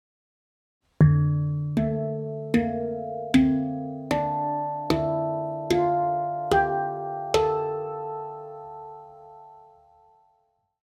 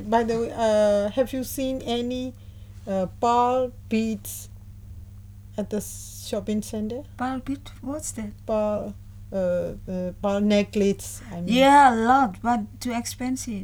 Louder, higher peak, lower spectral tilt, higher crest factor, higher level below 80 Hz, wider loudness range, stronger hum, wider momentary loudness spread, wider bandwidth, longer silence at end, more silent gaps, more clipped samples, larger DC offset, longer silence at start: about the same, -25 LUFS vs -24 LUFS; about the same, -6 dBFS vs -4 dBFS; first, -7.5 dB/octave vs -5 dB/octave; about the same, 20 dB vs 20 dB; about the same, -50 dBFS vs -46 dBFS; second, 7 LU vs 10 LU; second, none vs 50 Hz at -45 dBFS; about the same, 16 LU vs 16 LU; second, 13.5 kHz vs over 20 kHz; first, 1.3 s vs 0 s; neither; neither; neither; first, 1 s vs 0 s